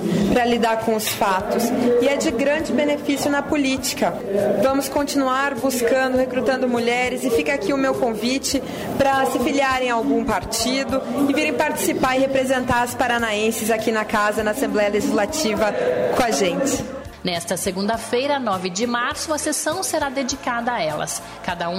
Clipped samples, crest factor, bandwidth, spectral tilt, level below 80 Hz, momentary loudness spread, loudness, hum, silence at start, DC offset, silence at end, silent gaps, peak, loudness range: under 0.1%; 14 dB; 16 kHz; -3.5 dB/octave; -46 dBFS; 5 LU; -20 LUFS; none; 0 s; under 0.1%; 0 s; none; -6 dBFS; 2 LU